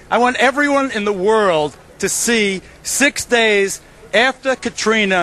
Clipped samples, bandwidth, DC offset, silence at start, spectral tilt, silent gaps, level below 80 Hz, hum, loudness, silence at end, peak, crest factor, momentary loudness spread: under 0.1%; 13 kHz; under 0.1%; 0.1 s; -2.5 dB/octave; none; -48 dBFS; none; -16 LUFS; 0 s; 0 dBFS; 16 dB; 8 LU